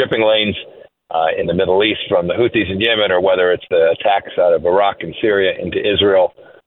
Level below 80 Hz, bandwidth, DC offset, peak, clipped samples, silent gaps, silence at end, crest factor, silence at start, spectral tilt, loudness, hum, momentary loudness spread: -52 dBFS; 4.1 kHz; under 0.1%; 0 dBFS; under 0.1%; none; 0.25 s; 14 dB; 0 s; -8 dB/octave; -15 LUFS; none; 5 LU